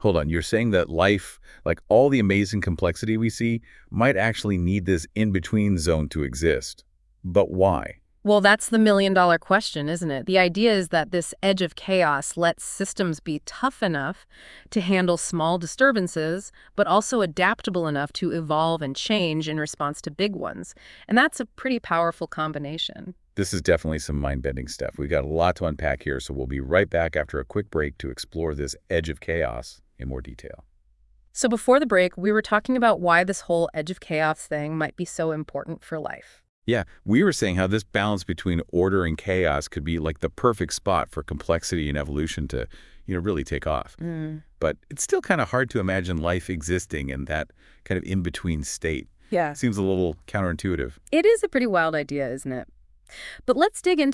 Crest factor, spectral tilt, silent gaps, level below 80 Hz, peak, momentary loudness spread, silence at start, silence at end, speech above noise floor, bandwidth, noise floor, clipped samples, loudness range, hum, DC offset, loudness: 20 dB; -5 dB/octave; 36.49-36.62 s; -44 dBFS; -4 dBFS; 12 LU; 0 s; 0 s; 35 dB; 12 kHz; -59 dBFS; under 0.1%; 6 LU; none; under 0.1%; -24 LUFS